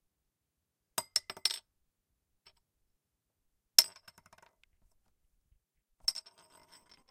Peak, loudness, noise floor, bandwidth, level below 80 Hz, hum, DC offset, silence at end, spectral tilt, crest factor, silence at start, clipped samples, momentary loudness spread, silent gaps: 0 dBFS; -31 LUFS; -86 dBFS; 16.5 kHz; -76 dBFS; none; under 0.1%; 0.9 s; 2.5 dB/octave; 40 dB; 1 s; under 0.1%; 15 LU; none